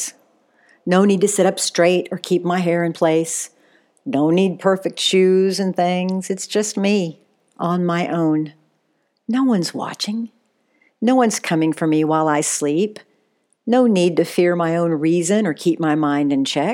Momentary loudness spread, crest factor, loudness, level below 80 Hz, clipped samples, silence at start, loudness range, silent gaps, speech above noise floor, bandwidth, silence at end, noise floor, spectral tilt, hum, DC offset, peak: 9 LU; 16 dB; -18 LUFS; -82 dBFS; under 0.1%; 0 s; 4 LU; none; 50 dB; 17 kHz; 0 s; -67 dBFS; -5 dB/octave; none; under 0.1%; -2 dBFS